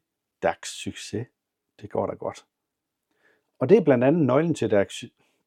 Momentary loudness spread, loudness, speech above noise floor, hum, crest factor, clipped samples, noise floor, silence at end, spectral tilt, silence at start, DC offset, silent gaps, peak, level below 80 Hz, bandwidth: 16 LU; -24 LUFS; 60 dB; none; 20 dB; under 0.1%; -83 dBFS; 0.4 s; -6.5 dB/octave; 0.4 s; under 0.1%; none; -4 dBFS; -68 dBFS; 13.5 kHz